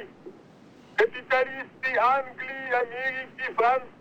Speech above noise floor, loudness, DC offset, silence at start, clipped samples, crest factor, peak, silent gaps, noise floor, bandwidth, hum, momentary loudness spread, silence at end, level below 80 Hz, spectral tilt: 25 dB; -26 LUFS; under 0.1%; 0 s; under 0.1%; 18 dB; -10 dBFS; none; -52 dBFS; over 20 kHz; none; 9 LU; 0.1 s; -70 dBFS; -4 dB/octave